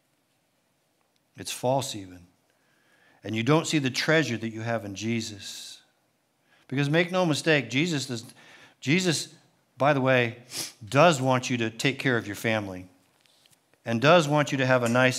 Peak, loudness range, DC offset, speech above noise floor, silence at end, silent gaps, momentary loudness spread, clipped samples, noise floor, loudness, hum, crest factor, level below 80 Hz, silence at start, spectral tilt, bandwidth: -6 dBFS; 5 LU; under 0.1%; 46 dB; 0 s; none; 17 LU; under 0.1%; -71 dBFS; -25 LUFS; none; 22 dB; -76 dBFS; 1.35 s; -5 dB/octave; 16 kHz